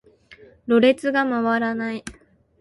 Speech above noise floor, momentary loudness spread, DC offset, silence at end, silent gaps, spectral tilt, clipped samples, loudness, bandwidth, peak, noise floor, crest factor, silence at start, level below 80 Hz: 30 dB; 18 LU; under 0.1%; 0.5 s; none; -5.5 dB/octave; under 0.1%; -20 LUFS; 11.5 kHz; -6 dBFS; -50 dBFS; 16 dB; 0.3 s; -58 dBFS